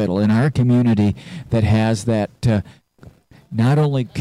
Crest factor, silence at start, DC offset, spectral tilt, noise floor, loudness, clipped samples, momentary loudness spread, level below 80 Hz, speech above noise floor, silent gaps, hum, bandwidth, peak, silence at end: 12 dB; 0 s; under 0.1%; -7.5 dB/octave; -46 dBFS; -18 LUFS; under 0.1%; 7 LU; -44 dBFS; 29 dB; none; none; 11.5 kHz; -6 dBFS; 0 s